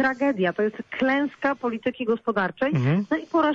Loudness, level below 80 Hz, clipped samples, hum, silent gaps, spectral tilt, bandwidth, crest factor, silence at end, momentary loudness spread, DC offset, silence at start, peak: -24 LUFS; -62 dBFS; under 0.1%; none; none; -8 dB/octave; 7.4 kHz; 12 dB; 0 s; 5 LU; under 0.1%; 0 s; -12 dBFS